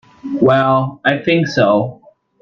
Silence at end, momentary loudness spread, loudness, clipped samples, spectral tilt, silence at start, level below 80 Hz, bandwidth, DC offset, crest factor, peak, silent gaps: 0.5 s; 7 LU; -14 LUFS; under 0.1%; -7 dB/octave; 0.25 s; -54 dBFS; 7.2 kHz; under 0.1%; 14 dB; 0 dBFS; none